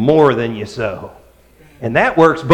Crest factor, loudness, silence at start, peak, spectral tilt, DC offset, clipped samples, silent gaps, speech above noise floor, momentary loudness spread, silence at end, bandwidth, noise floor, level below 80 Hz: 14 dB; -15 LUFS; 0 s; 0 dBFS; -7 dB/octave; under 0.1%; under 0.1%; none; 33 dB; 17 LU; 0 s; 9.8 kHz; -46 dBFS; -46 dBFS